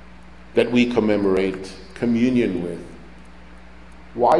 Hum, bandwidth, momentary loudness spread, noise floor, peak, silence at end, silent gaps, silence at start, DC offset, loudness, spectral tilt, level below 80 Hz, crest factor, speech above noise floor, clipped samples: none; 11.5 kHz; 18 LU; -44 dBFS; -4 dBFS; 0 s; none; 0 s; 0.6%; -21 LUFS; -6.5 dB/octave; -46 dBFS; 18 dB; 24 dB; under 0.1%